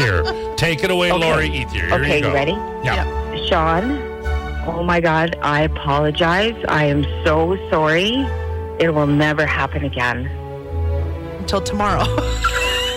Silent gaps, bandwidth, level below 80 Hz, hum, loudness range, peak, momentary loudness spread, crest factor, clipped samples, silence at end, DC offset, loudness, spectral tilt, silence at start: none; 16 kHz; -30 dBFS; none; 3 LU; -8 dBFS; 8 LU; 10 dB; under 0.1%; 0 s; under 0.1%; -18 LUFS; -5.5 dB/octave; 0 s